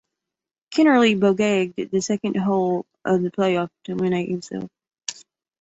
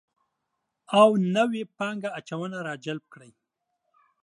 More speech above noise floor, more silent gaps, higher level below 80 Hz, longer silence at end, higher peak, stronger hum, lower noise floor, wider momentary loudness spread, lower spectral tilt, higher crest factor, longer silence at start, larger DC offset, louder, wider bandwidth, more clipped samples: first, 67 dB vs 56 dB; neither; first, -64 dBFS vs -78 dBFS; second, 0.5 s vs 1.05 s; about the same, -4 dBFS vs -6 dBFS; neither; first, -87 dBFS vs -81 dBFS; about the same, 17 LU vs 15 LU; about the same, -5.5 dB/octave vs -6 dB/octave; about the same, 18 dB vs 22 dB; second, 0.7 s vs 0.9 s; neither; first, -21 LUFS vs -25 LUFS; second, 8 kHz vs 11.5 kHz; neither